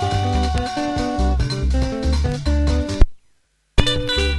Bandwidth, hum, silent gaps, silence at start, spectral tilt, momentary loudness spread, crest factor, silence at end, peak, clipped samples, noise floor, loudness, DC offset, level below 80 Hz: 11.5 kHz; none; none; 0 s; -5.5 dB/octave; 3 LU; 18 dB; 0 s; 0 dBFS; under 0.1%; -61 dBFS; -21 LUFS; under 0.1%; -20 dBFS